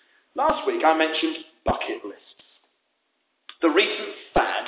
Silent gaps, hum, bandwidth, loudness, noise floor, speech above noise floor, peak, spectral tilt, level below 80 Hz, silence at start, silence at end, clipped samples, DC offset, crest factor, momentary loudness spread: none; none; 4 kHz; -23 LUFS; -73 dBFS; 50 dB; -6 dBFS; -8 dB/octave; -48 dBFS; 0.35 s; 0 s; under 0.1%; under 0.1%; 20 dB; 11 LU